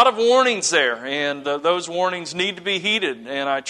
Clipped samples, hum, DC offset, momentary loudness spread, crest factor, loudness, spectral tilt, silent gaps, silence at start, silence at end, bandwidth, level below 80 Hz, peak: under 0.1%; none; under 0.1%; 7 LU; 18 dB; -20 LUFS; -2 dB/octave; none; 0 s; 0 s; 11 kHz; -70 dBFS; -2 dBFS